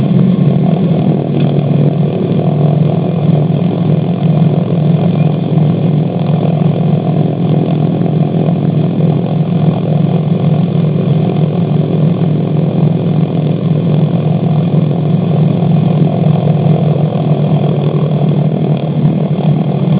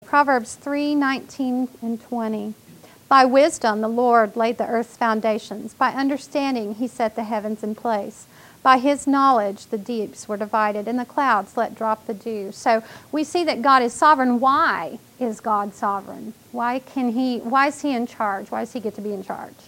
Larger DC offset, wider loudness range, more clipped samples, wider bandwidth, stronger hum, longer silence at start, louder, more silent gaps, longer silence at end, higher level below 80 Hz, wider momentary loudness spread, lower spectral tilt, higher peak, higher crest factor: neither; second, 1 LU vs 4 LU; neither; second, 4 kHz vs 16.5 kHz; neither; about the same, 0 s vs 0.1 s; first, -12 LUFS vs -21 LUFS; neither; second, 0 s vs 0.2 s; first, -48 dBFS vs -68 dBFS; second, 2 LU vs 12 LU; first, -13 dB/octave vs -4.5 dB/octave; about the same, 0 dBFS vs 0 dBFS; second, 10 dB vs 20 dB